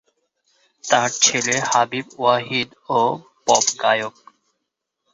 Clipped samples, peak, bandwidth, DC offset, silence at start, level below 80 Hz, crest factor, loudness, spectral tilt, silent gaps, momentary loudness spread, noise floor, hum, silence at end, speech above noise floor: under 0.1%; 0 dBFS; 8.2 kHz; under 0.1%; 0.85 s; -66 dBFS; 20 dB; -19 LUFS; -1.5 dB/octave; none; 8 LU; -79 dBFS; none; 1.05 s; 59 dB